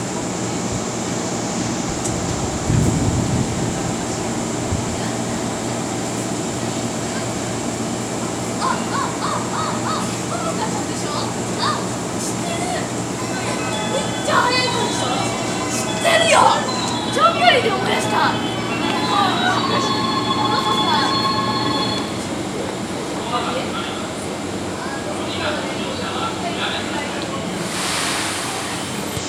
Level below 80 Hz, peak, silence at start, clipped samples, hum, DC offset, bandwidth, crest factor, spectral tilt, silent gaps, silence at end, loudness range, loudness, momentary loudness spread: -42 dBFS; 0 dBFS; 0 s; under 0.1%; none; under 0.1%; 18 kHz; 20 dB; -3.5 dB/octave; none; 0 s; 7 LU; -20 LUFS; 8 LU